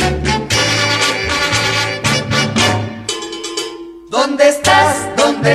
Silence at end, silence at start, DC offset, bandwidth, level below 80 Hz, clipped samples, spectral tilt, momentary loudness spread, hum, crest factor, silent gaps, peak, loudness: 0 s; 0 s; under 0.1%; 15 kHz; -34 dBFS; under 0.1%; -3.5 dB/octave; 11 LU; none; 14 dB; none; 0 dBFS; -14 LUFS